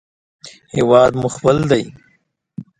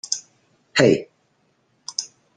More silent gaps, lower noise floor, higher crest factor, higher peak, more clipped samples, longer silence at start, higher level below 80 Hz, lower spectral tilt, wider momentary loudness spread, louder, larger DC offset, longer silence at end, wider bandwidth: neither; second, -61 dBFS vs -65 dBFS; about the same, 18 dB vs 22 dB; about the same, 0 dBFS vs -2 dBFS; neither; first, 0.45 s vs 0.1 s; first, -48 dBFS vs -62 dBFS; first, -6 dB/octave vs -4 dB/octave; first, 22 LU vs 13 LU; first, -15 LUFS vs -21 LUFS; neither; about the same, 0.2 s vs 0.3 s; about the same, 11 kHz vs 10 kHz